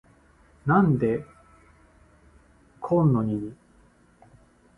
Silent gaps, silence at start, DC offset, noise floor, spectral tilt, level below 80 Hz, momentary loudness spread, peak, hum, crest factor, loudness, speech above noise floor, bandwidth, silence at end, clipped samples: none; 0.65 s; under 0.1%; -58 dBFS; -11 dB/octave; -56 dBFS; 14 LU; -8 dBFS; none; 20 dB; -24 LUFS; 36 dB; 3.7 kHz; 1.25 s; under 0.1%